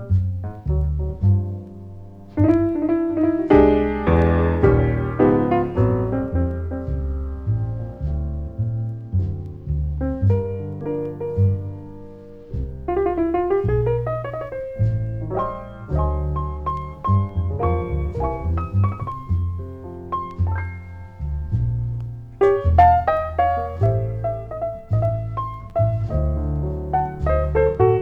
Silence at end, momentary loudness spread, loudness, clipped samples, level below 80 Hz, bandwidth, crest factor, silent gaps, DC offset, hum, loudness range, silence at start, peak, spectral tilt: 0 s; 13 LU; -22 LUFS; under 0.1%; -30 dBFS; 4.6 kHz; 18 dB; none; under 0.1%; none; 8 LU; 0 s; -2 dBFS; -11 dB/octave